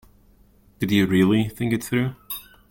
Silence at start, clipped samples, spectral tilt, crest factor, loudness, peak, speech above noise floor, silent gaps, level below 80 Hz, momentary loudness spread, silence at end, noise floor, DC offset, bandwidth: 0.8 s; under 0.1%; -6 dB/octave; 16 dB; -22 LUFS; -6 dBFS; 35 dB; none; -52 dBFS; 16 LU; 0.3 s; -55 dBFS; under 0.1%; 17 kHz